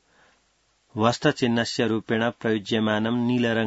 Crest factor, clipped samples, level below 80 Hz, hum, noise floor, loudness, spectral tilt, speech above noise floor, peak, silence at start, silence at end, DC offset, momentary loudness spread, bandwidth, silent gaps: 18 dB; under 0.1%; -62 dBFS; none; -67 dBFS; -24 LUFS; -5.5 dB/octave; 43 dB; -6 dBFS; 0.95 s; 0 s; under 0.1%; 3 LU; 8 kHz; none